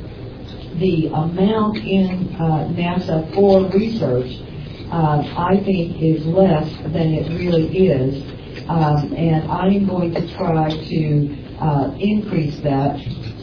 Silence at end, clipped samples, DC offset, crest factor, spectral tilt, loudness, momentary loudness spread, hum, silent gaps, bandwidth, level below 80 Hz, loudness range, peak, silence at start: 0 s; under 0.1%; under 0.1%; 16 dB; -9.5 dB/octave; -18 LUFS; 11 LU; none; none; 5.4 kHz; -38 dBFS; 2 LU; -2 dBFS; 0 s